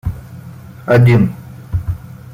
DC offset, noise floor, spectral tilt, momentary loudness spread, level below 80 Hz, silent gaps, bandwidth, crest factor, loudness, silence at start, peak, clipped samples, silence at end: under 0.1%; -33 dBFS; -9 dB/octave; 24 LU; -34 dBFS; none; 15.5 kHz; 14 dB; -14 LUFS; 0.05 s; -2 dBFS; under 0.1%; 0 s